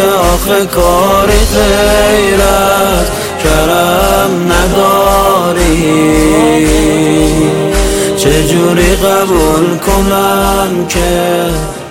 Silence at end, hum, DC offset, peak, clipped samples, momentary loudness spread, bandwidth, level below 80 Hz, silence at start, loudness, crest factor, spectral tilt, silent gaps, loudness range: 0 s; none; 0.7%; 0 dBFS; 0.2%; 4 LU; 17.5 kHz; -18 dBFS; 0 s; -9 LUFS; 8 dB; -4.5 dB/octave; none; 1 LU